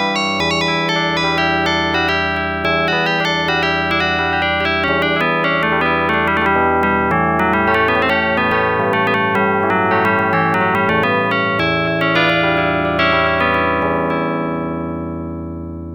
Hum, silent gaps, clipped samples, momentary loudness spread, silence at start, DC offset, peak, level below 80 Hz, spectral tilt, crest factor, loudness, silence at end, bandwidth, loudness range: none; none; under 0.1%; 4 LU; 0 s; under 0.1%; -4 dBFS; -40 dBFS; -5.5 dB/octave; 12 dB; -15 LUFS; 0 s; over 20 kHz; 1 LU